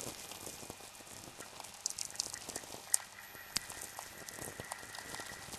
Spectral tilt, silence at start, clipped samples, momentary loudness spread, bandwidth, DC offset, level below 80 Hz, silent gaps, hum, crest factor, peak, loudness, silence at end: -0.5 dB/octave; 0 s; under 0.1%; 14 LU; 14 kHz; under 0.1%; -68 dBFS; none; none; 38 dB; -6 dBFS; -42 LUFS; 0 s